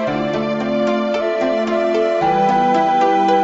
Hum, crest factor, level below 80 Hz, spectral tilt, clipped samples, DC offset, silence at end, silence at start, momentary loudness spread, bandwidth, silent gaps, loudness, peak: none; 12 dB; -50 dBFS; -6 dB/octave; under 0.1%; under 0.1%; 0 s; 0 s; 5 LU; 7.8 kHz; none; -17 LUFS; -4 dBFS